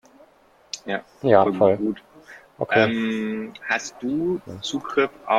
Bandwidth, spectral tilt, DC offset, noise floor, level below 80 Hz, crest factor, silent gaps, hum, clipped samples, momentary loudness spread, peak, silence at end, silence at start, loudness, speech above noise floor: 13 kHz; -5 dB/octave; under 0.1%; -56 dBFS; -62 dBFS; 22 dB; none; none; under 0.1%; 13 LU; -2 dBFS; 0 s; 0.75 s; -23 LUFS; 34 dB